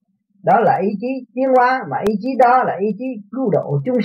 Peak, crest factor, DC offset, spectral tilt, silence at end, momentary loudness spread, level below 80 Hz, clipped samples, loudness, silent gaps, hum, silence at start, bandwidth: -2 dBFS; 14 dB; under 0.1%; -8.5 dB/octave; 0 s; 11 LU; -60 dBFS; under 0.1%; -17 LUFS; none; none; 0.45 s; 8.6 kHz